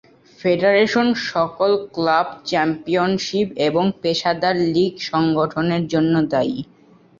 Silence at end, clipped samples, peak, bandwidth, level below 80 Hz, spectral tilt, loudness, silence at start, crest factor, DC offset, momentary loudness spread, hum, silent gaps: 0.55 s; under 0.1%; -4 dBFS; 7.6 kHz; -56 dBFS; -6 dB/octave; -19 LUFS; 0.4 s; 16 dB; under 0.1%; 5 LU; none; none